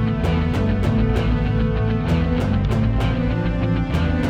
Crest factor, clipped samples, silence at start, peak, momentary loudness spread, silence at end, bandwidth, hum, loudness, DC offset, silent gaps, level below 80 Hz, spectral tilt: 12 dB; under 0.1%; 0 s; -6 dBFS; 2 LU; 0 s; 9 kHz; none; -20 LUFS; under 0.1%; none; -24 dBFS; -8.5 dB/octave